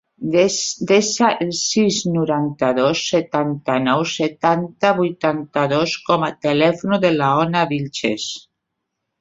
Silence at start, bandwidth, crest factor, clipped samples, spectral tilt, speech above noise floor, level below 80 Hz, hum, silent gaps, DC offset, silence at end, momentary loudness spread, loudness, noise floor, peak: 0.2 s; 8 kHz; 18 dB; under 0.1%; -4.5 dB/octave; 59 dB; -60 dBFS; none; none; under 0.1%; 0.8 s; 5 LU; -18 LUFS; -77 dBFS; 0 dBFS